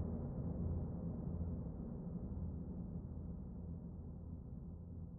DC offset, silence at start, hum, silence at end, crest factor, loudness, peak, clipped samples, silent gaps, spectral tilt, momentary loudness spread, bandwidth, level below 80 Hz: under 0.1%; 0 s; none; 0 s; 14 dB; -47 LUFS; -30 dBFS; under 0.1%; none; -13 dB/octave; 8 LU; 1.9 kHz; -52 dBFS